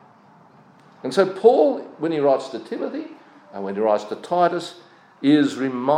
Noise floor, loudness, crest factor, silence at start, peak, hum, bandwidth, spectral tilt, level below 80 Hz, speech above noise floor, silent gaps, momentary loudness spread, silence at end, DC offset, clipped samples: -51 dBFS; -21 LUFS; 20 dB; 1.05 s; -2 dBFS; none; 11 kHz; -6 dB/octave; -82 dBFS; 31 dB; none; 17 LU; 0 s; under 0.1%; under 0.1%